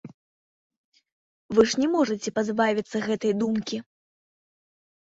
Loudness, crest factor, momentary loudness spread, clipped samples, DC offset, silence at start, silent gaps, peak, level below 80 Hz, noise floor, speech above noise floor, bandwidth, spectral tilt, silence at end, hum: -25 LUFS; 20 dB; 7 LU; under 0.1%; under 0.1%; 0.05 s; 0.14-0.70 s, 0.77-0.92 s, 1.12-1.49 s; -6 dBFS; -64 dBFS; under -90 dBFS; over 66 dB; 8 kHz; -4.5 dB/octave; 1.3 s; none